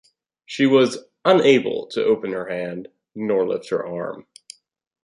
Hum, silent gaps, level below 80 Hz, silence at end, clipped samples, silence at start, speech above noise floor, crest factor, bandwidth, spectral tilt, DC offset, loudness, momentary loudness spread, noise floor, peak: none; none; -66 dBFS; 0.85 s; under 0.1%; 0.5 s; 27 dB; 18 dB; 11.5 kHz; -5.5 dB/octave; under 0.1%; -20 LUFS; 16 LU; -47 dBFS; -2 dBFS